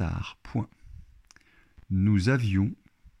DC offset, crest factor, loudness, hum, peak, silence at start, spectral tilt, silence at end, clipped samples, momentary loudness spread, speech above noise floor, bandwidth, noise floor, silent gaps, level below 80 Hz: under 0.1%; 18 dB; -27 LUFS; none; -12 dBFS; 0 s; -7.5 dB/octave; 0.45 s; under 0.1%; 13 LU; 33 dB; 10.5 kHz; -59 dBFS; none; -50 dBFS